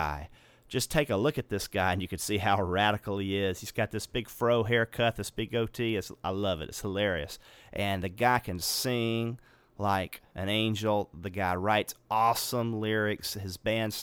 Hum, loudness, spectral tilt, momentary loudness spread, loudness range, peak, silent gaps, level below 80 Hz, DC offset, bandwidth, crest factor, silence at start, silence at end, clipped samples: none; -30 LUFS; -4.5 dB/octave; 9 LU; 2 LU; -12 dBFS; none; -54 dBFS; under 0.1%; over 20 kHz; 20 dB; 0 s; 0 s; under 0.1%